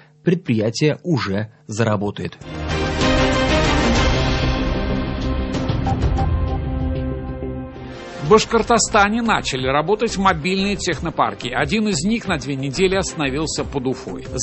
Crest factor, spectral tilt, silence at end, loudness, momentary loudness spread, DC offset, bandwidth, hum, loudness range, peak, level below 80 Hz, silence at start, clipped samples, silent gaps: 18 dB; -5 dB/octave; 0 s; -19 LUFS; 12 LU; under 0.1%; 8.6 kHz; none; 4 LU; 0 dBFS; -28 dBFS; 0.25 s; under 0.1%; none